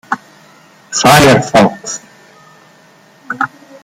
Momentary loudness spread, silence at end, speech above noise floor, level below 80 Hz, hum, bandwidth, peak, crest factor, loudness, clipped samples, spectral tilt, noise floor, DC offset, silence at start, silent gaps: 17 LU; 0.35 s; 36 dB; -42 dBFS; none; 19 kHz; 0 dBFS; 14 dB; -11 LUFS; under 0.1%; -4 dB/octave; -44 dBFS; under 0.1%; 0.1 s; none